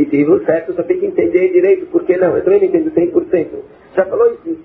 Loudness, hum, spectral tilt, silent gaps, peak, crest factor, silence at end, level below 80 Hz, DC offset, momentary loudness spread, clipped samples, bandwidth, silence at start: -14 LUFS; none; -8 dB/octave; none; 0 dBFS; 12 dB; 0.05 s; -52 dBFS; under 0.1%; 6 LU; under 0.1%; 3.2 kHz; 0 s